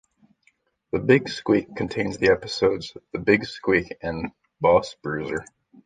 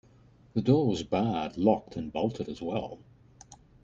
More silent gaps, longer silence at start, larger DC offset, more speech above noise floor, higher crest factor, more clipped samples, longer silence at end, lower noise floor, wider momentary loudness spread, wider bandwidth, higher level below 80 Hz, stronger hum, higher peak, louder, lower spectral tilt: neither; first, 0.95 s vs 0.55 s; neither; first, 43 dB vs 30 dB; about the same, 22 dB vs 20 dB; neither; first, 0.45 s vs 0.3 s; first, -66 dBFS vs -58 dBFS; about the same, 11 LU vs 11 LU; first, 9.4 kHz vs 8 kHz; first, -50 dBFS vs -58 dBFS; neither; first, -2 dBFS vs -10 dBFS; first, -23 LUFS vs -29 LUFS; second, -6 dB/octave vs -7.5 dB/octave